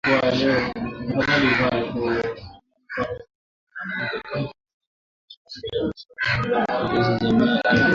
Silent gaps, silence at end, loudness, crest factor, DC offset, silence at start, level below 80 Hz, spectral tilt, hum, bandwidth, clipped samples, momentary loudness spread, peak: 3.35-3.67 s, 4.73-4.81 s, 4.87-5.28 s, 5.37-5.45 s; 0 s; -22 LUFS; 16 dB; under 0.1%; 0.05 s; -48 dBFS; -6.5 dB/octave; none; 7.4 kHz; under 0.1%; 15 LU; -6 dBFS